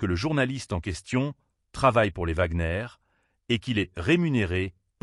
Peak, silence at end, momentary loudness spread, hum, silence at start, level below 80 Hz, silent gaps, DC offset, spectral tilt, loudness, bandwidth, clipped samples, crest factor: -8 dBFS; 0.3 s; 10 LU; none; 0 s; -42 dBFS; none; under 0.1%; -6 dB/octave; -26 LUFS; 11.5 kHz; under 0.1%; 18 dB